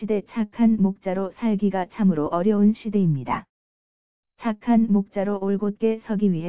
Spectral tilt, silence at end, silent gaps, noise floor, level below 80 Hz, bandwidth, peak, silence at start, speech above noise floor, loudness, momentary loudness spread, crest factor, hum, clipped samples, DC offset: -12.5 dB/octave; 0 s; 3.49-4.23 s; under -90 dBFS; -58 dBFS; 4 kHz; -10 dBFS; 0 s; over 68 dB; -23 LUFS; 8 LU; 14 dB; none; under 0.1%; 0.6%